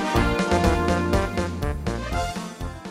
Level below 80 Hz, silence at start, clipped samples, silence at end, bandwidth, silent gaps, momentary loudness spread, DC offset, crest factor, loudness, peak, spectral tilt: -30 dBFS; 0 s; under 0.1%; 0 s; 16 kHz; none; 10 LU; under 0.1%; 16 dB; -24 LUFS; -6 dBFS; -6 dB/octave